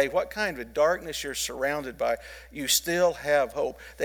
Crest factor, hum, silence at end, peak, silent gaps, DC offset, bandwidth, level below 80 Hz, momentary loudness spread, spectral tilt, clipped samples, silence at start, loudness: 18 dB; none; 0 s; -10 dBFS; none; under 0.1%; 19.5 kHz; -52 dBFS; 9 LU; -2 dB/octave; under 0.1%; 0 s; -27 LUFS